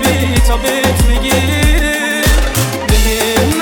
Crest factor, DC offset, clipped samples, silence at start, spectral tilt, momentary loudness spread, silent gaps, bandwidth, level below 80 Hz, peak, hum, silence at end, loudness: 10 dB; under 0.1%; under 0.1%; 0 s; -4 dB/octave; 1 LU; none; over 20 kHz; -16 dBFS; -2 dBFS; none; 0 s; -12 LUFS